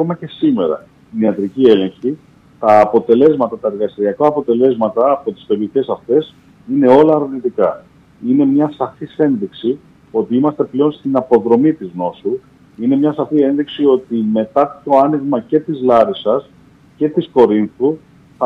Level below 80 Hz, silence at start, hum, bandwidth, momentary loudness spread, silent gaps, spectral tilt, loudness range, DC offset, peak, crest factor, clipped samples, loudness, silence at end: -56 dBFS; 0 s; none; 6 kHz; 10 LU; none; -9 dB/octave; 3 LU; under 0.1%; 0 dBFS; 14 dB; under 0.1%; -15 LUFS; 0 s